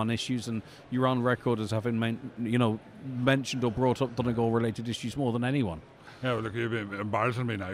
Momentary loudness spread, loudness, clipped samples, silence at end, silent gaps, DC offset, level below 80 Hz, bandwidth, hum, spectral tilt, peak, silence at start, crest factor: 8 LU; -30 LUFS; under 0.1%; 0 s; none; under 0.1%; -60 dBFS; 14 kHz; none; -6.5 dB/octave; -12 dBFS; 0 s; 18 dB